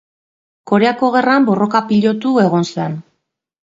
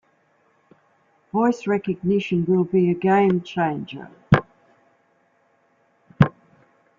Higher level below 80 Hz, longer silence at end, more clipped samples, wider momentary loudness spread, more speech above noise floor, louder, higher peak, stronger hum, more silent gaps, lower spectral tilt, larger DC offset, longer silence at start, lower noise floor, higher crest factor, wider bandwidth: second, -62 dBFS vs -52 dBFS; about the same, 0.75 s vs 0.7 s; neither; about the same, 9 LU vs 8 LU; first, 58 dB vs 43 dB; first, -14 LUFS vs -21 LUFS; about the same, 0 dBFS vs 0 dBFS; neither; neither; second, -6.5 dB/octave vs -8.5 dB/octave; neither; second, 0.65 s vs 1.35 s; first, -71 dBFS vs -63 dBFS; second, 16 dB vs 22 dB; about the same, 7.8 kHz vs 7.4 kHz